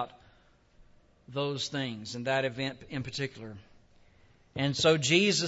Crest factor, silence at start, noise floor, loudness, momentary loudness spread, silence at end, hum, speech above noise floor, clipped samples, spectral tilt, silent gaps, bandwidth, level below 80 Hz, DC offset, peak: 22 dB; 0 s; -63 dBFS; -30 LUFS; 18 LU; 0 s; none; 33 dB; under 0.1%; -4 dB/octave; none; 8 kHz; -64 dBFS; under 0.1%; -12 dBFS